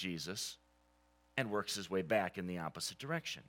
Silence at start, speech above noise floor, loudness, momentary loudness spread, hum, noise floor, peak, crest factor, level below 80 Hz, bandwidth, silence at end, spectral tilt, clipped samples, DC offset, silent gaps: 0 s; 32 dB; -39 LUFS; 7 LU; 60 Hz at -65 dBFS; -72 dBFS; -18 dBFS; 22 dB; -74 dBFS; 17 kHz; 0.05 s; -3.5 dB/octave; under 0.1%; under 0.1%; none